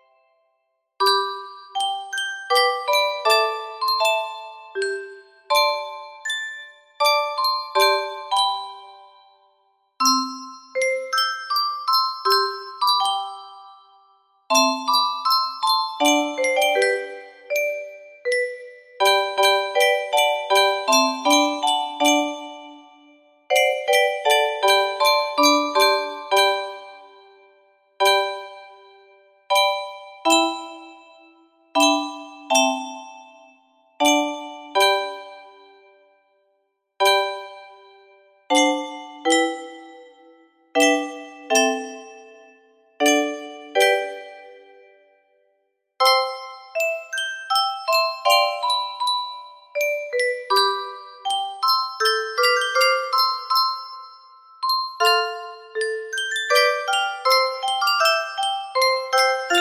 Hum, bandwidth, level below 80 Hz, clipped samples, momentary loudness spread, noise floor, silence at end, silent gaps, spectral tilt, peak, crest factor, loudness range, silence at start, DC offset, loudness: none; 15.5 kHz; -74 dBFS; under 0.1%; 15 LU; -72 dBFS; 0 s; none; 0.5 dB/octave; -4 dBFS; 20 dB; 5 LU; 1 s; under 0.1%; -20 LUFS